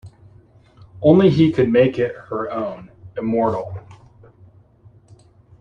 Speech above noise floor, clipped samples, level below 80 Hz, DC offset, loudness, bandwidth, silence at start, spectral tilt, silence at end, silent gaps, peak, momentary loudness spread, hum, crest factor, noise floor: 33 dB; under 0.1%; -52 dBFS; under 0.1%; -18 LUFS; 7.2 kHz; 0.05 s; -9 dB/octave; 1.65 s; none; -2 dBFS; 20 LU; none; 18 dB; -50 dBFS